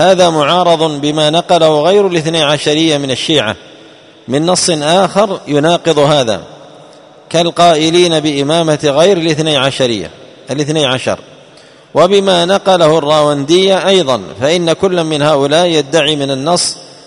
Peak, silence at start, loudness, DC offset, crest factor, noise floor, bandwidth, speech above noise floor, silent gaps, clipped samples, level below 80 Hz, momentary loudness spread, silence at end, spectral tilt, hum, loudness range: 0 dBFS; 0 s; -11 LUFS; under 0.1%; 12 dB; -40 dBFS; 11 kHz; 29 dB; none; 0.3%; -50 dBFS; 7 LU; 0.15 s; -4 dB/octave; none; 2 LU